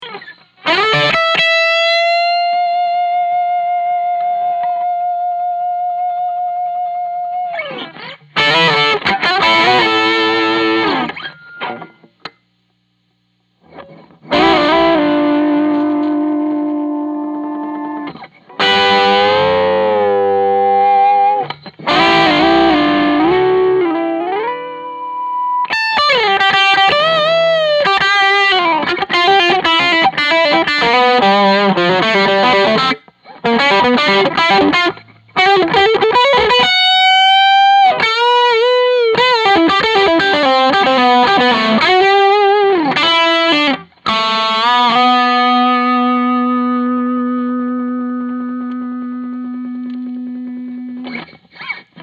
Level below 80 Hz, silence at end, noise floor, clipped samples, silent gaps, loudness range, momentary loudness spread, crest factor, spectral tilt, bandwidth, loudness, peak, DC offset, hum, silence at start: -50 dBFS; 0 s; -62 dBFS; under 0.1%; none; 9 LU; 14 LU; 12 dB; -4.5 dB/octave; 9.4 kHz; -12 LUFS; 0 dBFS; under 0.1%; none; 0 s